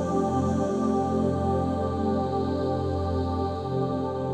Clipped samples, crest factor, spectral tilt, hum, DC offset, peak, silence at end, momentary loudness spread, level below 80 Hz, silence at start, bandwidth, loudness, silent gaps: under 0.1%; 12 dB; -8 dB/octave; none; under 0.1%; -14 dBFS; 0 s; 3 LU; -44 dBFS; 0 s; 9.6 kHz; -27 LUFS; none